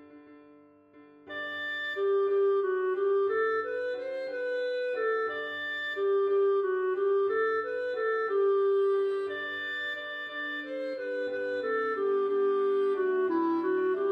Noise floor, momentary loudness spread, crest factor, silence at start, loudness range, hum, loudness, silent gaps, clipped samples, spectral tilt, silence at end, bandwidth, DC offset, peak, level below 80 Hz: -57 dBFS; 8 LU; 10 dB; 0 s; 3 LU; none; -29 LUFS; none; under 0.1%; -5 dB/octave; 0 s; 5 kHz; under 0.1%; -18 dBFS; -80 dBFS